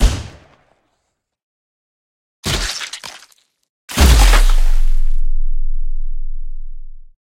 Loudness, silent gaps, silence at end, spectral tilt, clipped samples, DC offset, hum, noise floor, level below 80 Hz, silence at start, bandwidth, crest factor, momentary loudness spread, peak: -18 LUFS; 1.43-2.43 s, 3.69-3.88 s; 0.3 s; -3.5 dB/octave; under 0.1%; under 0.1%; none; -71 dBFS; -16 dBFS; 0 s; 16 kHz; 14 dB; 23 LU; 0 dBFS